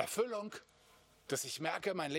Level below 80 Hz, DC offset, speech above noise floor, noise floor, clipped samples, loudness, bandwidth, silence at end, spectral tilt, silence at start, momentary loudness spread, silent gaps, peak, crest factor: -80 dBFS; under 0.1%; 28 dB; -66 dBFS; under 0.1%; -39 LUFS; 17 kHz; 0 s; -3 dB/octave; 0 s; 14 LU; none; -18 dBFS; 22 dB